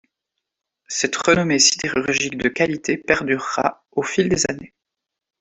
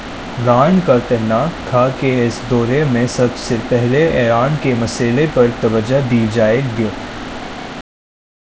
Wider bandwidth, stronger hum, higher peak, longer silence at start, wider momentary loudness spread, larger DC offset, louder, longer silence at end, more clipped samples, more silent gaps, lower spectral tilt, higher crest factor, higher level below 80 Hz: about the same, 8.4 kHz vs 8 kHz; neither; about the same, 0 dBFS vs 0 dBFS; first, 0.9 s vs 0 s; second, 9 LU vs 13 LU; second, under 0.1% vs 0.3%; second, -19 LUFS vs -15 LUFS; first, 0.75 s vs 0.6 s; neither; neither; second, -3 dB/octave vs -6.5 dB/octave; first, 20 dB vs 14 dB; second, -52 dBFS vs -38 dBFS